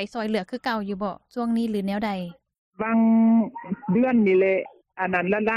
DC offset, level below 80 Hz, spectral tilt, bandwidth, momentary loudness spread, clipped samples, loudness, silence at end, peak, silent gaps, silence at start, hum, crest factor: under 0.1%; -62 dBFS; -8 dB/octave; 6 kHz; 12 LU; under 0.1%; -23 LUFS; 0 s; -10 dBFS; 2.58-2.71 s; 0 s; none; 12 dB